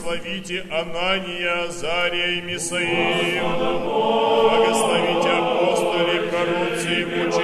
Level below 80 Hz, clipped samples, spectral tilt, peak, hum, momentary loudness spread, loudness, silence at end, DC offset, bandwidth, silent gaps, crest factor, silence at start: -50 dBFS; under 0.1%; -3.5 dB/octave; -4 dBFS; none; 7 LU; -21 LUFS; 0 s; under 0.1%; 13 kHz; none; 16 dB; 0 s